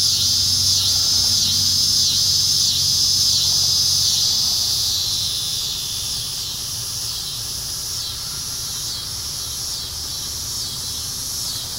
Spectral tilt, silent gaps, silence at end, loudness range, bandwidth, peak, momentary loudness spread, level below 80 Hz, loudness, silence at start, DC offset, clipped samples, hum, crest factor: 0 dB/octave; none; 0 s; 9 LU; 16 kHz; -4 dBFS; 10 LU; -44 dBFS; -17 LUFS; 0 s; under 0.1%; under 0.1%; none; 18 dB